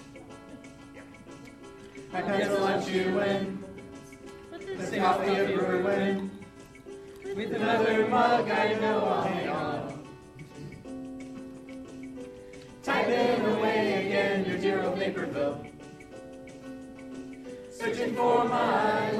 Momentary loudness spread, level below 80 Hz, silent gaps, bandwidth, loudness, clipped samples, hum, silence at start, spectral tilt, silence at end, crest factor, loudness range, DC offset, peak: 22 LU; -62 dBFS; none; 14 kHz; -28 LUFS; under 0.1%; none; 0 s; -5.5 dB/octave; 0 s; 18 dB; 7 LU; under 0.1%; -10 dBFS